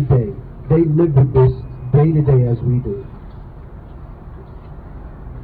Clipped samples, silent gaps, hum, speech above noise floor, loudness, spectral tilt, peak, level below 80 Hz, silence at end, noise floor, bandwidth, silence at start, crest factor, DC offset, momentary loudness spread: under 0.1%; none; none; 21 dB; -16 LUFS; -13.5 dB/octave; -4 dBFS; -34 dBFS; 0 s; -34 dBFS; 4 kHz; 0 s; 14 dB; 0.2%; 23 LU